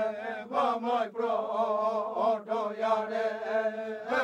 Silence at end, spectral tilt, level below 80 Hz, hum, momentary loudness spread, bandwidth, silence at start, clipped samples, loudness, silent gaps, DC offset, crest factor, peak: 0 s; -5 dB/octave; -78 dBFS; none; 4 LU; 9.4 kHz; 0 s; under 0.1%; -30 LUFS; none; under 0.1%; 14 dB; -16 dBFS